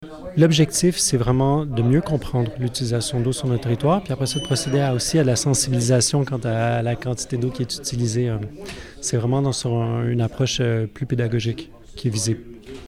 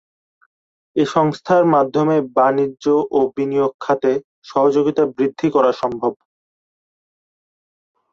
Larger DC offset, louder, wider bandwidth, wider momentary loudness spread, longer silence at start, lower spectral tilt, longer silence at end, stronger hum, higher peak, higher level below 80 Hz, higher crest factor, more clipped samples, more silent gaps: neither; second, -21 LUFS vs -18 LUFS; first, 15 kHz vs 7.8 kHz; about the same, 8 LU vs 6 LU; second, 0 s vs 0.95 s; second, -5 dB/octave vs -7 dB/octave; second, 0 s vs 2 s; neither; second, -6 dBFS vs -2 dBFS; first, -42 dBFS vs -62 dBFS; about the same, 16 dB vs 16 dB; neither; second, none vs 3.74-3.79 s, 4.24-4.42 s